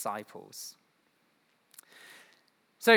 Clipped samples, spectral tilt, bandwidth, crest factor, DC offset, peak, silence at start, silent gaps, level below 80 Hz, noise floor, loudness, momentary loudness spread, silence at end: under 0.1%; -2.5 dB/octave; over 20 kHz; 26 dB; under 0.1%; -6 dBFS; 0 s; none; under -90 dBFS; -71 dBFS; -38 LUFS; 21 LU; 0 s